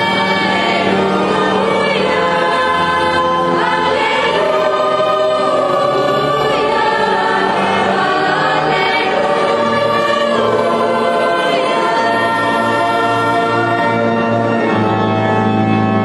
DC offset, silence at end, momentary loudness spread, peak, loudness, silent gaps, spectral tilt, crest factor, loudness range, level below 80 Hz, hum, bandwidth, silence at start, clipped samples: under 0.1%; 0 s; 1 LU; -2 dBFS; -13 LUFS; none; -5.5 dB/octave; 12 dB; 0 LU; -50 dBFS; none; 12 kHz; 0 s; under 0.1%